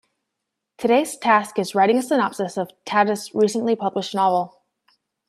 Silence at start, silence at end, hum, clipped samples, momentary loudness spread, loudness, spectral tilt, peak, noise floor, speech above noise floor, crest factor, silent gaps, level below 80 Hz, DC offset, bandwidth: 0.8 s; 0.8 s; none; under 0.1%; 8 LU; -21 LUFS; -4.5 dB/octave; -2 dBFS; -81 dBFS; 61 dB; 18 dB; none; -70 dBFS; under 0.1%; 14 kHz